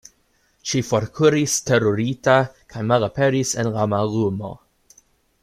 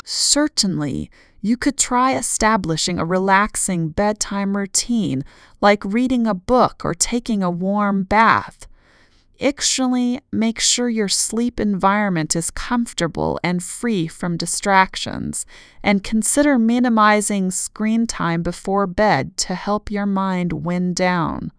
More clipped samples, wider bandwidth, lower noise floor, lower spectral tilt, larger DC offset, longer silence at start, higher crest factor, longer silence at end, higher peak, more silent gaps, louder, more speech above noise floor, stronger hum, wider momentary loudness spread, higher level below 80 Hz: neither; first, 15.5 kHz vs 11 kHz; first, -63 dBFS vs -53 dBFS; first, -5 dB/octave vs -3.5 dB/octave; neither; first, 0.65 s vs 0.05 s; about the same, 20 dB vs 18 dB; first, 0.85 s vs 0.1 s; about the same, -2 dBFS vs 0 dBFS; neither; about the same, -20 LUFS vs -19 LUFS; first, 44 dB vs 34 dB; neither; about the same, 10 LU vs 8 LU; second, -54 dBFS vs -42 dBFS